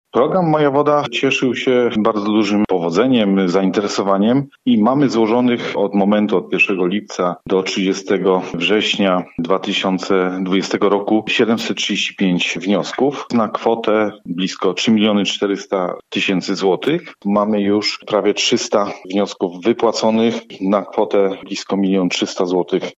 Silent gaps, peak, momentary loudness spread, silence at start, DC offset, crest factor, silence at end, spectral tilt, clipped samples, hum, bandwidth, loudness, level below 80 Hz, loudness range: none; -2 dBFS; 5 LU; 0.15 s; under 0.1%; 14 dB; 0.05 s; -5 dB/octave; under 0.1%; none; 8 kHz; -17 LUFS; -58 dBFS; 2 LU